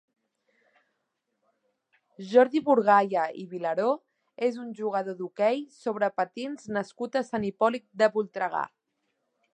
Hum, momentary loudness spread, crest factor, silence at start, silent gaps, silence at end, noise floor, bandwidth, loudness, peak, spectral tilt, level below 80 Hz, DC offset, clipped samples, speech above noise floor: none; 12 LU; 22 dB; 2.2 s; none; 0.85 s; -80 dBFS; 9.2 kHz; -27 LUFS; -6 dBFS; -6 dB/octave; -76 dBFS; under 0.1%; under 0.1%; 53 dB